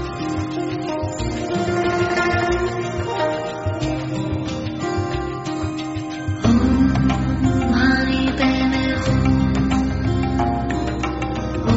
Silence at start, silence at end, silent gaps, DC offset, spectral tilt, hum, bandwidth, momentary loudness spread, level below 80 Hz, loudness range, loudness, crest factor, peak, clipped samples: 0 s; 0 s; none; under 0.1%; -5.5 dB/octave; none; 8 kHz; 8 LU; -30 dBFS; 6 LU; -21 LUFS; 16 dB; -4 dBFS; under 0.1%